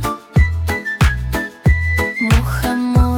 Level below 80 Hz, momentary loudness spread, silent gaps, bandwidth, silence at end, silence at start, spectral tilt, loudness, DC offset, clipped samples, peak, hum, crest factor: -20 dBFS; 5 LU; none; 18 kHz; 0 s; 0 s; -6 dB/octave; -17 LUFS; under 0.1%; under 0.1%; -2 dBFS; none; 12 dB